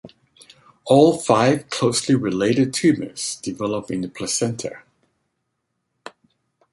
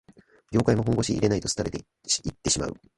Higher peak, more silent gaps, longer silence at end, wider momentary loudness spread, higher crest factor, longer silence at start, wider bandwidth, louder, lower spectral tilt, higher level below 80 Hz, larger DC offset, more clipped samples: first, -2 dBFS vs -6 dBFS; neither; first, 1.95 s vs 0.25 s; first, 12 LU vs 6 LU; about the same, 20 dB vs 20 dB; second, 0.05 s vs 0.5 s; about the same, 11.5 kHz vs 11.5 kHz; first, -20 LUFS vs -26 LUFS; about the same, -5 dB/octave vs -4.5 dB/octave; second, -58 dBFS vs -46 dBFS; neither; neither